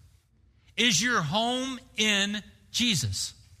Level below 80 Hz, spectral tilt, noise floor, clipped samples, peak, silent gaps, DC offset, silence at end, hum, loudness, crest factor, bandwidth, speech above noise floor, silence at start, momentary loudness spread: -58 dBFS; -2.5 dB/octave; -63 dBFS; under 0.1%; -8 dBFS; none; under 0.1%; 0.25 s; none; -26 LUFS; 20 dB; 15.5 kHz; 36 dB; 0.75 s; 11 LU